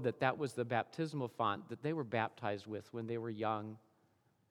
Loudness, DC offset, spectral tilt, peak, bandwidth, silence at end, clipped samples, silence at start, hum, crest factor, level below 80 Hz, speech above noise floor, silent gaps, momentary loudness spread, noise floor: -39 LUFS; under 0.1%; -6.5 dB/octave; -16 dBFS; 15 kHz; 0.7 s; under 0.1%; 0 s; none; 24 dB; -88 dBFS; 36 dB; none; 8 LU; -75 dBFS